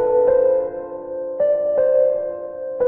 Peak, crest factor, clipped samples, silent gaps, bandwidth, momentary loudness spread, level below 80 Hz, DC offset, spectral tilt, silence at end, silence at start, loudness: -6 dBFS; 12 dB; under 0.1%; none; 2.6 kHz; 13 LU; -56 dBFS; under 0.1%; -7 dB/octave; 0 s; 0 s; -19 LUFS